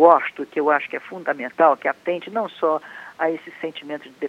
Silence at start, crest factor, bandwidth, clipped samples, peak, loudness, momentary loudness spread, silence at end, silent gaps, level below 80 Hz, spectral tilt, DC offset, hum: 0 s; 20 dB; 7.4 kHz; under 0.1%; 0 dBFS; -22 LUFS; 14 LU; 0 s; none; -78 dBFS; -6 dB/octave; under 0.1%; none